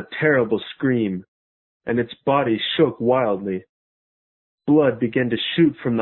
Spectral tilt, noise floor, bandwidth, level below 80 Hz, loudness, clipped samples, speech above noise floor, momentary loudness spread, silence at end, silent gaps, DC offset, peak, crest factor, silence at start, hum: -11 dB/octave; under -90 dBFS; 4.2 kHz; -58 dBFS; -20 LUFS; under 0.1%; over 70 dB; 10 LU; 0 s; 1.28-1.80 s, 3.69-4.58 s; under 0.1%; -4 dBFS; 18 dB; 0 s; none